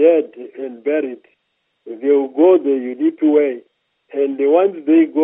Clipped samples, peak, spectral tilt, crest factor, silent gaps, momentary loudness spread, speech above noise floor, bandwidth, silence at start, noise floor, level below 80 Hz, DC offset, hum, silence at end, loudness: under 0.1%; -2 dBFS; -10 dB/octave; 14 dB; none; 17 LU; 54 dB; 3.7 kHz; 0 s; -69 dBFS; -82 dBFS; under 0.1%; none; 0 s; -16 LUFS